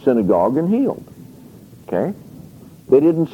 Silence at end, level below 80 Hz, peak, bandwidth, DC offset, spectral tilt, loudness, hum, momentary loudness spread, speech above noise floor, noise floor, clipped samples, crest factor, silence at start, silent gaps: 0 s; -56 dBFS; -2 dBFS; 17 kHz; under 0.1%; -9.5 dB/octave; -17 LUFS; none; 12 LU; 26 dB; -42 dBFS; under 0.1%; 16 dB; 0 s; none